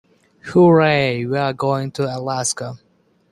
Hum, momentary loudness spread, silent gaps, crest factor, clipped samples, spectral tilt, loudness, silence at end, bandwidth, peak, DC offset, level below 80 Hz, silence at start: none; 13 LU; none; 16 dB; under 0.1%; -5.5 dB/octave; -18 LUFS; 0.55 s; 12.5 kHz; -2 dBFS; under 0.1%; -56 dBFS; 0.45 s